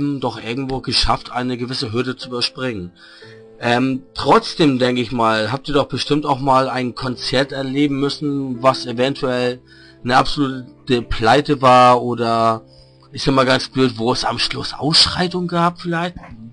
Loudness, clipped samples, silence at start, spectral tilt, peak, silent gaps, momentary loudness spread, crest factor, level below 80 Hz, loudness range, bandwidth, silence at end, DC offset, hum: -17 LUFS; under 0.1%; 0 s; -5 dB/octave; -2 dBFS; none; 10 LU; 16 dB; -38 dBFS; 5 LU; 10.5 kHz; 0 s; under 0.1%; none